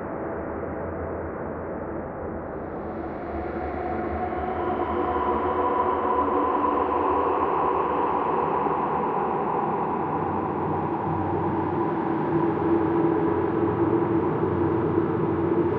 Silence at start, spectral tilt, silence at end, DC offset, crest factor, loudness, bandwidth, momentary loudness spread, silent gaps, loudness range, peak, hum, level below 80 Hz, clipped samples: 0 s; -11 dB/octave; 0 s; under 0.1%; 16 dB; -25 LUFS; 4.5 kHz; 9 LU; none; 8 LU; -10 dBFS; none; -48 dBFS; under 0.1%